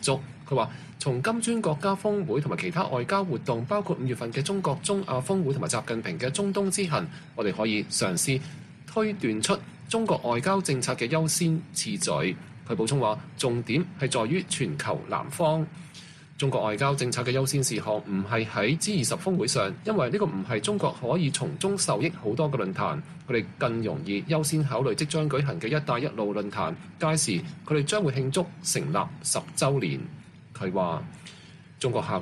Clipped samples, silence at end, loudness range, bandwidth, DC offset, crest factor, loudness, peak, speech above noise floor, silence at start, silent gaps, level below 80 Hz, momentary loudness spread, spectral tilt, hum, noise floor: under 0.1%; 0 s; 2 LU; 13.5 kHz; under 0.1%; 18 dB; -27 LUFS; -10 dBFS; 20 dB; 0 s; none; -62 dBFS; 6 LU; -4.5 dB/octave; none; -47 dBFS